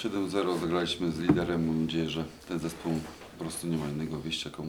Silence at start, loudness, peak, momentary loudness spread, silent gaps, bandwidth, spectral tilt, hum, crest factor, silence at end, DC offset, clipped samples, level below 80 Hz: 0 s; -31 LUFS; -8 dBFS; 9 LU; none; over 20 kHz; -5.5 dB/octave; none; 22 dB; 0 s; under 0.1%; under 0.1%; -54 dBFS